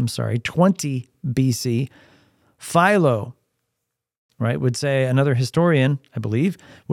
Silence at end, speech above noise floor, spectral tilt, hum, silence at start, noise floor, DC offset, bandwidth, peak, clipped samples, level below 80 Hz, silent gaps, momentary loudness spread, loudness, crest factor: 0 s; 60 dB; -6 dB/octave; none; 0 s; -80 dBFS; under 0.1%; 15.5 kHz; -2 dBFS; under 0.1%; -58 dBFS; 4.18-4.29 s; 10 LU; -20 LUFS; 18 dB